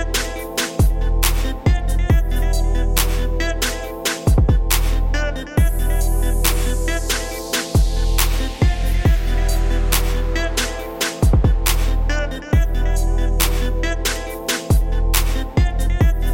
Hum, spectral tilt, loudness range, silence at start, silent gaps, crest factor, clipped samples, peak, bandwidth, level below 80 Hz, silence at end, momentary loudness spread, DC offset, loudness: none; -4.5 dB/octave; 1 LU; 0 s; none; 16 dB; under 0.1%; 0 dBFS; 17 kHz; -18 dBFS; 0 s; 5 LU; 0.4%; -20 LUFS